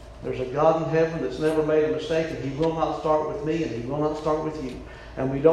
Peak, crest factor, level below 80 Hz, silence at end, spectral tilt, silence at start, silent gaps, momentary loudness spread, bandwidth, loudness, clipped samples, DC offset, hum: -6 dBFS; 20 dB; -46 dBFS; 0 s; -7 dB/octave; 0 s; none; 10 LU; 12 kHz; -25 LUFS; under 0.1%; under 0.1%; none